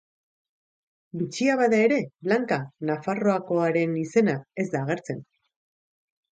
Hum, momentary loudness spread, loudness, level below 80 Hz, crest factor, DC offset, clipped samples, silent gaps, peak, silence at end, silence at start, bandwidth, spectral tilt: none; 11 LU; -25 LUFS; -72 dBFS; 18 dB; under 0.1%; under 0.1%; none; -8 dBFS; 1.1 s; 1.15 s; 9.2 kHz; -6.5 dB/octave